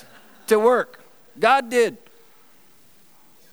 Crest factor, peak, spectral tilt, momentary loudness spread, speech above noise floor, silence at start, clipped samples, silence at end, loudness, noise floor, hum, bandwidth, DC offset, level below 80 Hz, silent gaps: 20 dB; -4 dBFS; -3.5 dB/octave; 11 LU; 37 dB; 0.5 s; under 0.1%; 1.55 s; -19 LUFS; -56 dBFS; none; over 20 kHz; 0.3%; -80 dBFS; none